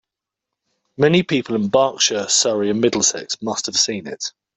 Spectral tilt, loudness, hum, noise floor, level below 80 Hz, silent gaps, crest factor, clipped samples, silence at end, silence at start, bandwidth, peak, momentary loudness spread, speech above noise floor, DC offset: -3 dB/octave; -18 LUFS; none; -84 dBFS; -60 dBFS; none; 18 dB; under 0.1%; 0.25 s; 1 s; 8.4 kHz; -2 dBFS; 9 LU; 65 dB; under 0.1%